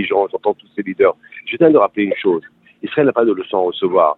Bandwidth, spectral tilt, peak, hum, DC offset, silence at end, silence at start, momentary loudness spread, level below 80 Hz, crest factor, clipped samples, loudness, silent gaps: 4.1 kHz; -9 dB/octave; 0 dBFS; none; under 0.1%; 0.05 s; 0 s; 13 LU; -62 dBFS; 16 dB; under 0.1%; -16 LUFS; none